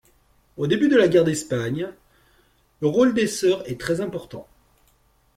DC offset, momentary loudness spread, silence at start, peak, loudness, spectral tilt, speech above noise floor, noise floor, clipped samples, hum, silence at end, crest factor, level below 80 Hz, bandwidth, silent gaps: under 0.1%; 16 LU; 0.6 s; -6 dBFS; -21 LUFS; -5.5 dB/octave; 41 dB; -61 dBFS; under 0.1%; none; 0.95 s; 18 dB; -56 dBFS; 15.5 kHz; none